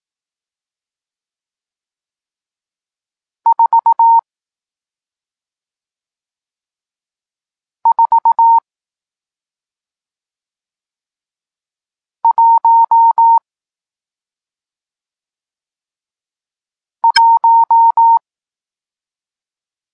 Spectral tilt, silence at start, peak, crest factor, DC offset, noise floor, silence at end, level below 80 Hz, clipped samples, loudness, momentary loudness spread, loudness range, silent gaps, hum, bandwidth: 5 dB/octave; 3.45 s; 0 dBFS; 16 dB; under 0.1%; under -90 dBFS; 1.75 s; -72 dBFS; under 0.1%; -11 LUFS; 7 LU; 7 LU; none; none; 7.6 kHz